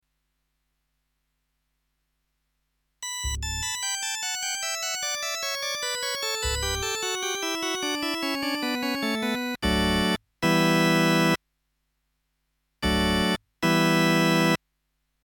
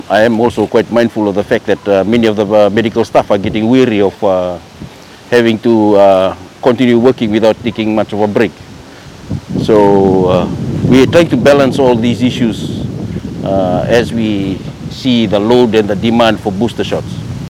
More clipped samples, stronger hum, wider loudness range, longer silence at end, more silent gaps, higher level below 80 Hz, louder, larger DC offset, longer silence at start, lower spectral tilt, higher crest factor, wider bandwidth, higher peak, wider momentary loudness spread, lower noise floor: second, under 0.1% vs 1%; neither; first, 8 LU vs 3 LU; first, 0.75 s vs 0 s; neither; about the same, -42 dBFS vs -38 dBFS; second, -25 LUFS vs -11 LUFS; neither; first, 3 s vs 0.05 s; second, -3.5 dB/octave vs -6.5 dB/octave; first, 20 dB vs 10 dB; first, 19 kHz vs 14.5 kHz; second, -8 dBFS vs 0 dBFS; second, 7 LU vs 11 LU; first, -76 dBFS vs -32 dBFS